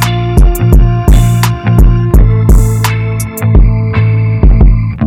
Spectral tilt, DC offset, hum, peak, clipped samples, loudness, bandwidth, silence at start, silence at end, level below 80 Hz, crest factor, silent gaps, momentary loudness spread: -6.5 dB/octave; under 0.1%; none; 0 dBFS; under 0.1%; -9 LUFS; 16 kHz; 0 s; 0 s; -8 dBFS; 6 dB; none; 3 LU